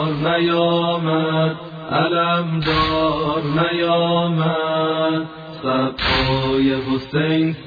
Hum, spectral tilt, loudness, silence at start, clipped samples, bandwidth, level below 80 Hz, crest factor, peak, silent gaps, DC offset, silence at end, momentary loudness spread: none; -8 dB/octave; -19 LUFS; 0 s; under 0.1%; 5 kHz; -40 dBFS; 14 dB; -4 dBFS; none; under 0.1%; 0 s; 5 LU